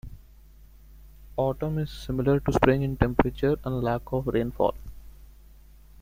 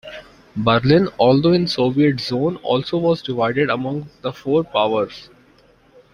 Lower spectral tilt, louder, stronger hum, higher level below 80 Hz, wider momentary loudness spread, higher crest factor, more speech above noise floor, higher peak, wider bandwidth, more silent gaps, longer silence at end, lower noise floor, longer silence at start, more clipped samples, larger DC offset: about the same, -8 dB/octave vs -7.5 dB/octave; second, -26 LUFS vs -18 LUFS; neither; first, -40 dBFS vs -52 dBFS; second, 10 LU vs 13 LU; first, 26 dB vs 18 dB; second, 26 dB vs 35 dB; about the same, -2 dBFS vs -2 dBFS; first, 16 kHz vs 10.5 kHz; neither; second, 0.75 s vs 0.9 s; about the same, -51 dBFS vs -53 dBFS; about the same, 0.05 s vs 0.05 s; neither; neither